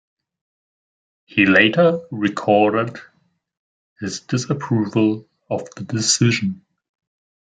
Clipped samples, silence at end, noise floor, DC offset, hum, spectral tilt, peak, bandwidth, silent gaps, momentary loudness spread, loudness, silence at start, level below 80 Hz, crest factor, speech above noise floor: under 0.1%; 0.9 s; under -90 dBFS; under 0.1%; none; -4.5 dB/octave; 0 dBFS; 9.6 kHz; 3.57-3.96 s; 15 LU; -18 LUFS; 1.35 s; -64 dBFS; 20 dB; over 72 dB